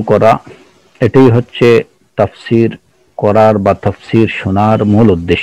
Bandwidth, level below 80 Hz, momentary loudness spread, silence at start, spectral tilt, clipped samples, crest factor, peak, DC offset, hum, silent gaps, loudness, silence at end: 10.5 kHz; -40 dBFS; 8 LU; 0 s; -8 dB/octave; 3%; 10 dB; 0 dBFS; under 0.1%; none; none; -11 LUFS; 0 s